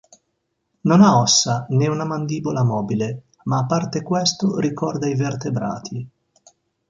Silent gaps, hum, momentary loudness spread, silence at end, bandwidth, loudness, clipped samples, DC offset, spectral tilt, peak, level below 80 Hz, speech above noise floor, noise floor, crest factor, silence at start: none; none; 14 LU; 0.8 s; 9.2 kHz; -19 LUFS; under 0.1%; under 0.1%; -5 dB/octave; -2 dBFS; -58 dBFS; 54 dB; -73 dBFS; 18 dB; 0.85 s